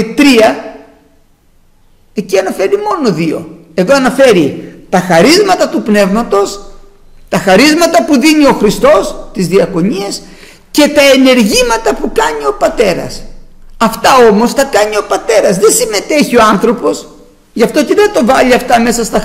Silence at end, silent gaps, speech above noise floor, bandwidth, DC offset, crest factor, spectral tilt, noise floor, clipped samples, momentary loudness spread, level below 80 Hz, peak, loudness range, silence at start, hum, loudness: 0 s; none; 38 dB; 16.5 kHz; under 0.1%; 10 dB; -4 dB/octave; -46 dBFS; 0.1%; 12 LU; -32 dBFS; 0 dBFS; 3 LU; 0 s; none; -9 LUFS